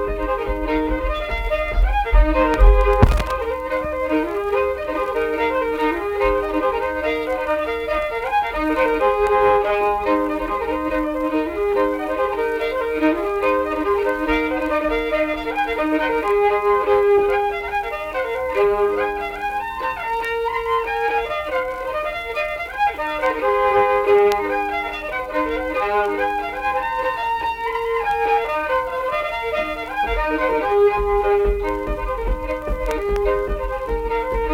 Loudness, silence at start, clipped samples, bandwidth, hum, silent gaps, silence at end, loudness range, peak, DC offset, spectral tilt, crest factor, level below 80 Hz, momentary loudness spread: -20 LUFS; 0 s; under 0.1%; 16 kHz; none; none; 0 s; 3 LU; 0 dBFS; under 0.1%; -6.5 dB/octave; 20 dB; -28 dBFS; 7 LU